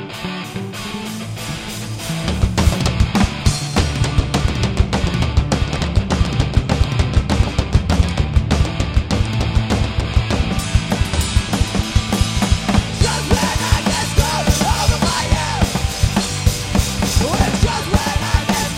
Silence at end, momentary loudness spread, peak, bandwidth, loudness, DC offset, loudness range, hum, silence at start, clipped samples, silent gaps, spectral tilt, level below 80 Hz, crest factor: 0 s; 7 LU; 0 dBFS; 16.5 kHz; -18 LUFS; under 0.1%; 2 LU; none; 0 s; under 0.1%; none; -4.5 dB/octave; -22 dBFS; 16 dB